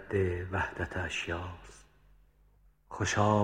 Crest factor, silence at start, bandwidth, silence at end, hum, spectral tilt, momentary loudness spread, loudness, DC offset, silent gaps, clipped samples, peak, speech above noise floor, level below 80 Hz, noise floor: 22 dB; 0 s; 10 kHz; 0 s; 50 Hz at -60 dBFS; -5 dB/octave; 19 LU; -33 LUFS; under 0.1%; none; under 0.1%; -12 dBFS; 32 dB; -54 dBFS; -64 dBFS